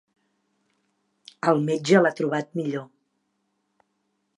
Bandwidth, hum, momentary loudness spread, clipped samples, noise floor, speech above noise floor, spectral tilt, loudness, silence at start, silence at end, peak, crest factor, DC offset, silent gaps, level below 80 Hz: 11.5 kHz; none; 11 LU; under 0.1%; -74 dBFS; 52 dB; -6 dB/octave; -23 LUFS; 1.45 s; 1.5 s; -4 dBFS; 22 dB; under 0.1%; none; -78 dBFS